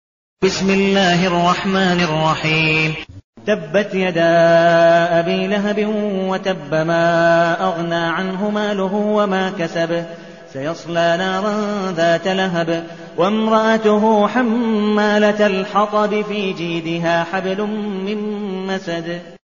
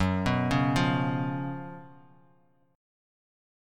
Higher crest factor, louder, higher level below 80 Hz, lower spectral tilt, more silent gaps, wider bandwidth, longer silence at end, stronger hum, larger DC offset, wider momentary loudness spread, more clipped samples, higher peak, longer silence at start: about the same, 14 dB vs 18 dB; first, -17 LUFS vs -28 LUFS; about the same, -52 dBFS vs -50 dBFS; second, -4 dB/octave vs -6.5 dB/octave; first, 3.24-3.33 s vs none; second, 7.4 kHz vs 13 kHz; second, 0.1 s vs 1.85 s; neither; first, 0.3% vs under 0.1%; second, 9 LU vs 16 LU; neither; first, -2 dBFS vs -12 dBFS; first, 0.4 s vs 0 s